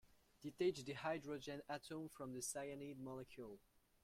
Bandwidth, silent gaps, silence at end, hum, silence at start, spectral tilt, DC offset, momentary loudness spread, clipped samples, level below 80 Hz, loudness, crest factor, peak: 16.5 kHz; none; 0.45 s; none; 0.05 s; -4 dB/octave; under 0.1%; 14 LU; under 0.1%; -78 dBFS; -48 LUFS; 20 dB; -30 dBFS